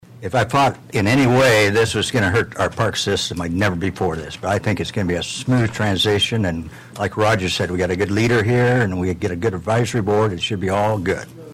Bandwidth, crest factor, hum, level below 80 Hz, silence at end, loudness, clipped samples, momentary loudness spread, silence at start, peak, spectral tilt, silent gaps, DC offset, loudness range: 15.5 kHz; 10 dB; none; -44 dBFS; 0 s; -19 LUFS; under 0.1%; 7 LU; 0.1 s; -8 dBFS; -5 dB/octave; none; under 0.1%; 3 LU